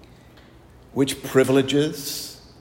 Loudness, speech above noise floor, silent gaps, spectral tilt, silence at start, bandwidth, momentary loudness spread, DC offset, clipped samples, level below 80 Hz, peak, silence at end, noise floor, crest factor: -22 LUFS; 28 dB; none; -5 dB/octave; 0.95 s; 16.5 kHz; 13 LU; under 0.1%; under 0.1%; -54 dBFS; -4 dBFS; 0.25 s; -49 dBFS; 18 dB